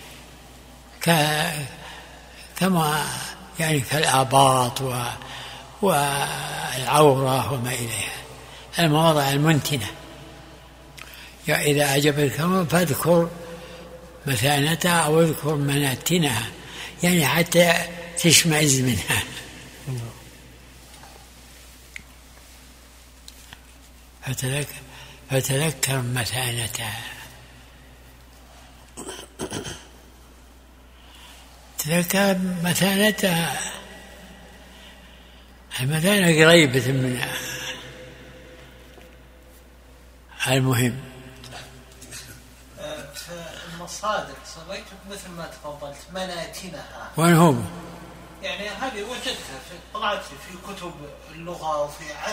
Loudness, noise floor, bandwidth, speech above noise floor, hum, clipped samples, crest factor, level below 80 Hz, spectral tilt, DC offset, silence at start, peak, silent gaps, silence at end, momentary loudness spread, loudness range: -21 LUFS; -48 dBFS; 16 kHz; 27 dB; none; under 0.1%; 24 dB; -50 dBFS; -4 dB/octave; under 0.1%; 0 s; 0 dBFS; none; 0 s; 23 LU; 14 LU